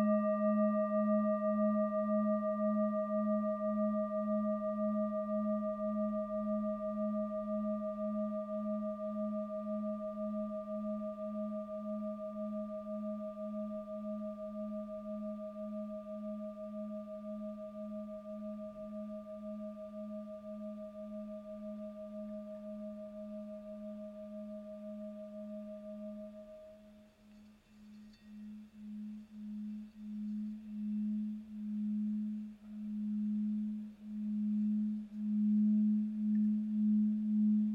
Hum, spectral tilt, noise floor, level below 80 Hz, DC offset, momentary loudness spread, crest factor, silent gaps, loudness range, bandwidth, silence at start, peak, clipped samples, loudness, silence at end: none; -10.5 dB/octave; -60 dBFS; -72 dBFS; under 0.1%; 15 LU; 16 dB; none; 14 LU; 3.7 kHz; 0 s; -22 dBFS; under 0.1%; -38 LUFS; 0 s